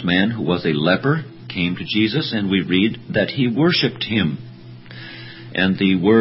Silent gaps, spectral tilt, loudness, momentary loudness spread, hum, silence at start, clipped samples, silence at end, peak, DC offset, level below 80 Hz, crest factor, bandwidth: none; -9.5 dB/octave; -19 LUFS; 18 LU; none; 0 s; under 0.1%; 0 s; -2 dBFS; under 0.1%; -48 dBFS; 18 dB; 5.8 kHz